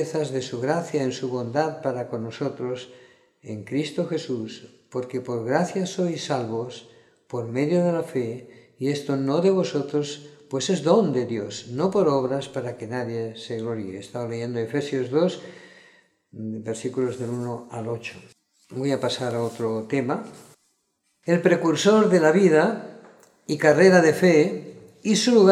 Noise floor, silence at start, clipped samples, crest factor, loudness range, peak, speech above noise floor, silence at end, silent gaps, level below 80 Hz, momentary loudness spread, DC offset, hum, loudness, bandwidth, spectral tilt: -72 dBFS; 0 s; under 0.1%; 20 dB; 10 LU; -4 dBFS; 49 dB; 0 s; none; -70 dBFS; 17 LU; under 0.1%; none; -24 LUFS; 13.5 kHz; -5.5 dB/octave